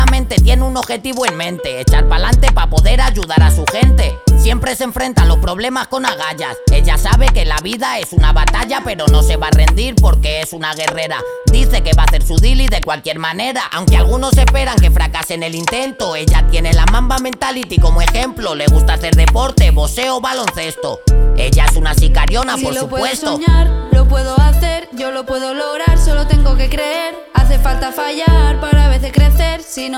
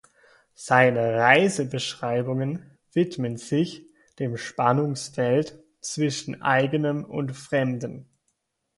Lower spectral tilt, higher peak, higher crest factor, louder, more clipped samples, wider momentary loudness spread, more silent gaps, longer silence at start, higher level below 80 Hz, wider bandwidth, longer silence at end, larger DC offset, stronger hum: about the same, -5 dB/octave vs -5.5 dB/octave; about the same, 0 dBFS vs -2 dBFS; second, 10 dB vs 22 dB; first, -14 LUFS vs -24 LUFS; neither; second, 7 LU vs 14 LU; neither; second, 0 s vs 0.6 s; first, -12 dBFS vs -66 dBFS; first, 16 kHz vs 11.5 kHz; second, 0 s vs 0.75 s; neither; neither